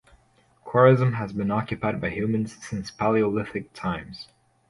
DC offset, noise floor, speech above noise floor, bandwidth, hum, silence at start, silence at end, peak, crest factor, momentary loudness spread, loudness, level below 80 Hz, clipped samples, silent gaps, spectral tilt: under 0.1%; -61 dBFS; 38 dB; 11.5 kHz; none; 0.65 s; 0.45 s; -4 dBFS; 22 dB; 16 LU; -24 LUFS; -52 dBFS; under 0.1%; none; -7.5 dB/octave